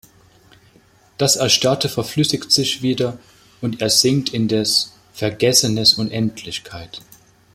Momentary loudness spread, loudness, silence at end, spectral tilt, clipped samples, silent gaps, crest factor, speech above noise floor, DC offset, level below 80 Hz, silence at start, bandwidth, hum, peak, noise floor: 15 LU; -17 LUFS; 0.55 s; -3.5 dB/octave; under 0.1%; none; 20 dB; 34 dB; under 0.1%; -54 dBFS; 1.2 s; 16.5 kHz; none; 0 dBFS; -53 dBFS